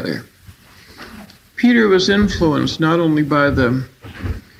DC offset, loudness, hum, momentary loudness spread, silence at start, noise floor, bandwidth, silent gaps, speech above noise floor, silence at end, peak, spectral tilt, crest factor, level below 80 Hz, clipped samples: under 0.1%; -15 LUFS; none; 20 LU; 0 s; -44 dBFS; 15 kHz; none; 29 dB; 0.2 s; -2 dBFS; -6 dB/octave; 16 dB; -36 dBFS; under 0.1%